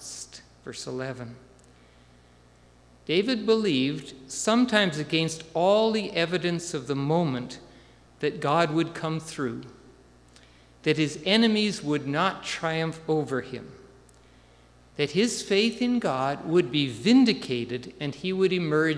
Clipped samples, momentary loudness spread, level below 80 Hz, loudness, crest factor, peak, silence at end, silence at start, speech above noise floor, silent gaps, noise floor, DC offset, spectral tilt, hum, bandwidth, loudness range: under 0.1%; 16 LU; -60 dBFS; -26 LUFS; 22 dB; -6 dBFS; 0 s; 0 s; 30 dB; none; -56 dBFS; under 0.1%; -5 dB/octave; none; 11 kHz; 6 LU